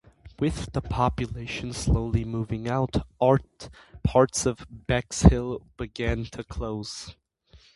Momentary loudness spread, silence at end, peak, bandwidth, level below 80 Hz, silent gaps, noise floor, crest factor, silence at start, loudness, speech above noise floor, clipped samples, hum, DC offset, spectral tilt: 16 LU; 0.65 s; -2 dBFS; 11.5 kHz; -34 dBFS; none; -57 dBFS; 24 dB; 0.25 s; -26 LUFS; 31 dB; under 0.1%; none; under 0.1%; -6 dB/octave